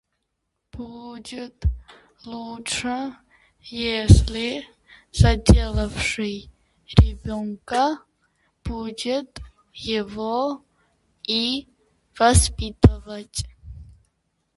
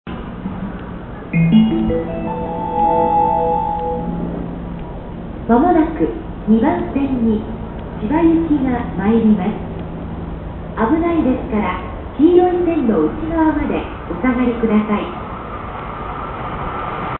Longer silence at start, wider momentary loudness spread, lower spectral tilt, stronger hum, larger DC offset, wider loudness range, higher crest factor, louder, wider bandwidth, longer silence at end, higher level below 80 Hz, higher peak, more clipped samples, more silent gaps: first, 0.75 s vs 0.05 s; first, 20 LU vs 14 LU; second, -5 dB/octave vs -13 dB/octave; neither; neither; first, 9 LU vs 3 LU; about the same, 22 dB vs 18 dB; second, -22 LUFS vs -18 LUFS; first, 11.5 kHz vs 4 kHz; first, 0.75 s vs 0 s; about the same, -28 dBFS vs -32 dBFS; about the same, 0 dBFS vs 0 dBFS; neither; neither